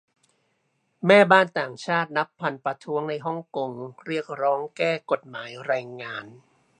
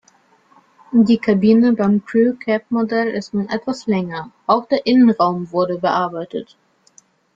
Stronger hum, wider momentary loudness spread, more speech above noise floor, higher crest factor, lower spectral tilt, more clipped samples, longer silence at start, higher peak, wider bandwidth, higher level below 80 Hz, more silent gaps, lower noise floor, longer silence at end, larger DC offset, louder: neither; first, 17 LU vs 10 LU; first, 47 dB vs 39 dB; first, 24 dB vs 16 dB; second, -5.5 dB/octave vs -7.5 dB/octave; neither; about the same, 1 s vs 0.9 s; about the same, -2 dBFS vs -2 dBFS; first, 10 kHz vs 7.6 kHz; second, -76 dBFS vs -60 dBFS; neither; first, -72 dBFS vs -55 dBFS; second, 0.45 s vs 0.95 s; neither; second, -24 LUFS vs -17 LUFS